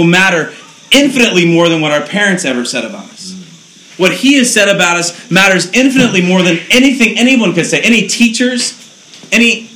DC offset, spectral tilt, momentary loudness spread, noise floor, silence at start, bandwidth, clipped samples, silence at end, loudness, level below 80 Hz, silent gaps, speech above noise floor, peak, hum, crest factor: under 0.1%; -3.5 dB/octave; 9 LU; -37 dBFS; 0 s; over 20 kHz; 0.6%; 0.1 s; -9 LUFS; -50 dBFS; none; 27 dB; 0 dBFS; none; 10 dB